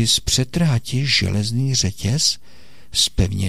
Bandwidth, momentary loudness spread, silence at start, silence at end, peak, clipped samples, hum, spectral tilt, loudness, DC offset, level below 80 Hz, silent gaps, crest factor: 15.5 kHz; 4 LU; 0 s; 0 s; -4 dBFS; under 0.1%; none; -3.5 dB/octave; -19 LUFS; 2%; -34 dBFS; none; 16 dB